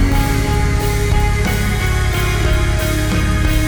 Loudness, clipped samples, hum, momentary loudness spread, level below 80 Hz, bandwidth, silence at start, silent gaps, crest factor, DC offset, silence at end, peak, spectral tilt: -17 LUFS; under 0.1%; none; 1 LU; -18 dBFS; over 20 kHz; 0 s; none; 10 dB; under 0.1%; 0 s; -4 dBFS; -5 dB/octave